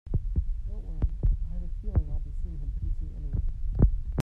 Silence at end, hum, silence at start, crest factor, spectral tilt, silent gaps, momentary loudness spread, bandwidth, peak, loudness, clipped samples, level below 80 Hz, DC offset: 0 s; none; 0.05 s; 18 dB; -9.5 dB/octave; none; 11 LU; 1.9 kHz; -10 dBFS; -33 LUFS; under 0.1%; -28 dBFS; under 0.1%